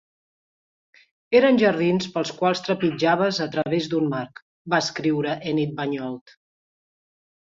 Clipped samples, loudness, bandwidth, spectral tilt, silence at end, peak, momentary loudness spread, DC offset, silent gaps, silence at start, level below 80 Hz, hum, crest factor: under 0.1%; -22 LUFS; 7.8 kHz; -5.5 dB/octave; 1.4 s; -6 dBFS; 12 LU; under 0.1%; 4.42-4.65 s; 1.3 s; -66 dBFS; none; 18 dB